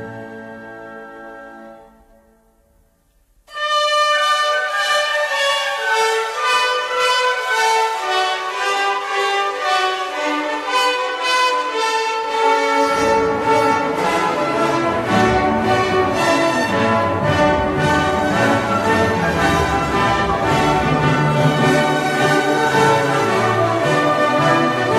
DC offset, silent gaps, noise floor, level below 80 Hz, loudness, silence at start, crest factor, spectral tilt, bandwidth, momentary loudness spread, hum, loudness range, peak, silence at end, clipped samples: under 0.1%; none; -58 dBFS; -42 dBFS; -16 LUFS; 0 s; 16 dB; -4.5 dB/octave; 14 kHz; 5 LU; none; 3 LU; -2 dBFS; 0 s; under 0.1%